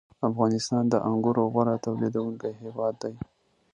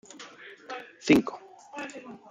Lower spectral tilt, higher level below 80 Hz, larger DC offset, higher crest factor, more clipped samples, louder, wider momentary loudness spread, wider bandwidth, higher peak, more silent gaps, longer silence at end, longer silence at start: first, -7 dB/octave vs -5 dB/octave; about the same, -62 dBFS vs -64 dBFS; neither; second, 18 dB vs 24 dB; neither; about the same, -27 LUFS vs -27 LUFS; second, 11 LU vs 23 LU; second, 10 kHz vs 15.5 kHz; about the same, -8 dBFS vs -6 dBFS; neither; first, 0.5 s vs 0.15 s; about the same, 0.2 s vs 0.15 s